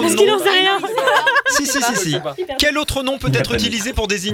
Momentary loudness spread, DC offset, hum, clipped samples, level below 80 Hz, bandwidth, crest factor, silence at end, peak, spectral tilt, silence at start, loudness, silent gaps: 7 LU; under 0.1%; none; under 0.1%; -36 dBFS; 18.5 kHz; 14 dB; 0 s; -2 dBFS; -3 dB/octave; 0 s; -16 LUFS; none